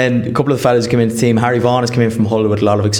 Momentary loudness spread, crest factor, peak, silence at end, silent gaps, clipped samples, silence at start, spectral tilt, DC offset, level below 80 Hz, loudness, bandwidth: 2 LU; 12 dB; -2 dBFS; 0 s; none; under 0.1%; 0 s; -6 dB/octave; under 0.1%; -46 dBFS; -14 LUFS; 17.5 kHz